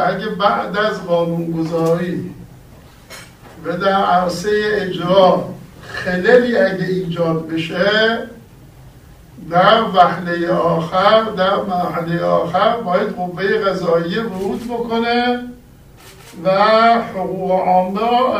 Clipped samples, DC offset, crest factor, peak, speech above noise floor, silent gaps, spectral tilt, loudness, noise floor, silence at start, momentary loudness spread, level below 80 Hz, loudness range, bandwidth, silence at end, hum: under 0.1%; under 0.1%; 16 dB; 0 dBFS; 27 dB; none; -6 dB/octave; -16 LUFS; -42 dBFS; 0 s; 12 LU; -48 dBFS; 4 LU; 15.5 kHz; 0 s; none